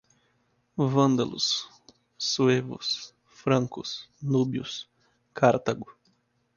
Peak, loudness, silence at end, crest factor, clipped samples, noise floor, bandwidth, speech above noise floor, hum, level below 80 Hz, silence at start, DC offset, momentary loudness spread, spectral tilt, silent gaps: -6 dBFS; -27 LUFS; 0.65 s; 22 dB; under 0.1%; -70 dBFS; 7.2 kHz; 44 dB; none; -66 dBFS; 0.75 s; under 0.1%; 16 LU; -5 dB/octave; none